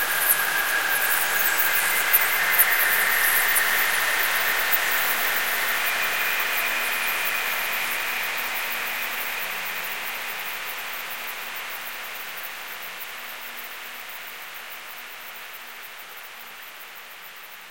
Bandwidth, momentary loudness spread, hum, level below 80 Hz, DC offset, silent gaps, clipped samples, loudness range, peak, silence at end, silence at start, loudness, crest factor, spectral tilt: 17 kHz; 19 LU; none; -70 dBFS; 0.6%; none; under 0.1%; 16 LU; -2 dBFS; 0 s; 0 s; -22 LUFS; 24 dB; 1 dB/octave